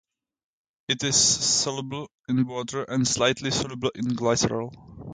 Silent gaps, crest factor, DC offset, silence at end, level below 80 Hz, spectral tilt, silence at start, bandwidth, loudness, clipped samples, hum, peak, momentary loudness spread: 2.14-2.24 s; 20 dB; under 0.1%; 0 s; -54 dBFS; -3 dB/octave; 0.9 s; 9.6 kHz; -24 LUFS; under 0.1%; none; -8 dBFS; 16 LU